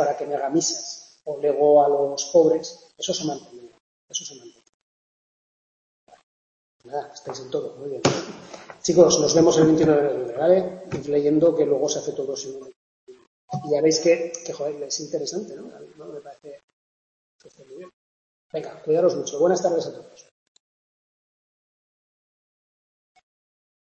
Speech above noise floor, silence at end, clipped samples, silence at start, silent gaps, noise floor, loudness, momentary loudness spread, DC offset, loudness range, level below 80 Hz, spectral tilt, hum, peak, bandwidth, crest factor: over 68 dB; 3.9 s; under 0.1%; 0 s; 3.80-4.08 s, 4.69-6.07 s, 6.23-6.80 s, 12.76-13.07 s, 13.27-13.48 s, 16.64-17.39 s, 17.93-18.50 s; under -90 dBFS; -22 LUFS; 21 LU; under 0.1%; 18 LU; -64 dBFS; -4.5 dB/octave; none; -2 dBFS; 8.2 kHz; 22 dB